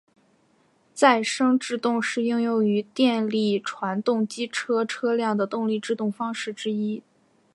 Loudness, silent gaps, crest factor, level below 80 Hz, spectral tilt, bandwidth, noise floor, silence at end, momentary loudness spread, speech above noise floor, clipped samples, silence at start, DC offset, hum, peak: -24 LUFS; none; 22 dB; -78 dBFS; -4.5 dB/octave; 11.5 kHz; -63 dBFS; 0.55 s; 8 LU; 40 dB; under 0.1%; 0.95 s; under 0.1%; none; -4 dBFS